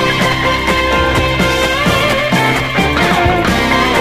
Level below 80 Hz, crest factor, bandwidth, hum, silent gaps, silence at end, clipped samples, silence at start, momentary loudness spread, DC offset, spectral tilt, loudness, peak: -26 dBFS; 12 dB; 15.5 kHz; none; none; 0 s; under 0.1%; 0 s; 1 LU; under 0.1%; -4.5 dB/octave; -12 LUFS; 0 dBFS